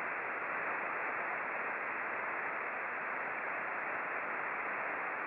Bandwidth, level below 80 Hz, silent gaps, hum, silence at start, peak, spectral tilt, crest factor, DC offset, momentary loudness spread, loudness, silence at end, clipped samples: 5.8 kHz; -84 dBFS; none; none; 0 s; -26 dBFS; -2 dB/octave; 12 dB; under 0.1%; 1 LU; -37 LUFS; 0 s; under 0.1%